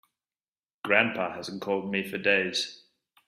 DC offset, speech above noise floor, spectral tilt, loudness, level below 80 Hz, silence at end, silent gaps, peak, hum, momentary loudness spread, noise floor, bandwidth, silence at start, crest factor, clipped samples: under 0.1%; over 62 dB; -3.5 dB/octave; -27 LUFS; -74 dBFS; 0.55 s; none; -6 dBFS; none; 12 LU; under -90 dBFS; 15 kHz; 0.85 s; 24 dB; under 0.1%